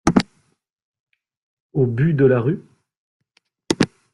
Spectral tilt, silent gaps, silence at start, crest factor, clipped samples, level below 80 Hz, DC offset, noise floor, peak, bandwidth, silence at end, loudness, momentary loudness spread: -6.5 dB/octave; 0.73-0.94 s, 1.00-1.07 s, 1.37-1.70 s, 2.97-3.20 s; 0.05 s; 20 dB; under 0.1%; -48 dBFS; under 0.1%; -65 dBFS; -2 dBFS; 11.5 kHz; 0.3 s; -20 LUFS; 12 LU